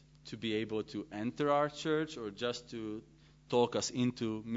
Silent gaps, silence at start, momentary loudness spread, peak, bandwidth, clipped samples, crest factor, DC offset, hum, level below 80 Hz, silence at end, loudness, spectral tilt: none; 0.25 s; 11 LU; -16 dBFS; 7.6 kHz; under 0.1%; 20 dB; under 0.1%; none; -68 dBFS; 0 s; -36 LUFS; -4.5 dB/octave